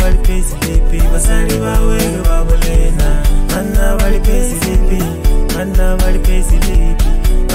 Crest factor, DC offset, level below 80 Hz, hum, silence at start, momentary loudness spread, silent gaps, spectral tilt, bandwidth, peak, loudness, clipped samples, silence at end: 8 dB; 0.1%; -10 dBFS; none; 0 s; 2 LU; none; -5 dB/octave; 16 kHz; 0 dBFS; -15 LUFS; under 0.1%; 0 s